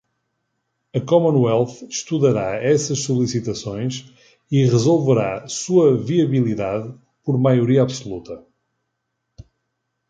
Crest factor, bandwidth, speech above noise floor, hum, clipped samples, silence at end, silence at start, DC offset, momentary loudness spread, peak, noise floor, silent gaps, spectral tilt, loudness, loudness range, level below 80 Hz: 16 dB; 9.2 kHz; 57 dB; none; under 0.1%; 1.7 s; 0.95 s; under 0.1%; 13 LU; -2 dBFS; -76 dBFS; none; -6.5 dB/octave; -19 LUFS; 3 LU; -54 dBFS